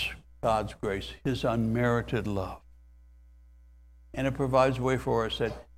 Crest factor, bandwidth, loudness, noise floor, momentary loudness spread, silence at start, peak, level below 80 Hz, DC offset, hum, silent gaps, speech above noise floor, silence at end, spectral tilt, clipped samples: 20 dB; 15.5 kHz; -29 LUFS; -55 dBFS; 9 LU; 0 s; -10 dBFS; -48 dBFS; under 0.1%; none; none; 26 dB; 0.15 s; -6.5 dB/octave; under 0.1%